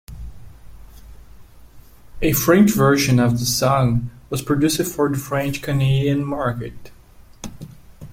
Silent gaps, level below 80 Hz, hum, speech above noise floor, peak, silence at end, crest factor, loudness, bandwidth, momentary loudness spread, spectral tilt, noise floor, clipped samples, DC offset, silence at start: none; -40 dBFS; none; 26 dB; -2 dBFS; 0 s; 18 dB; -18 LUFS; 16.5 kHz; 22 LU; -5.5 dB/octave; -44 dBFS; under 0.1%; under 0.1%; 0.1 s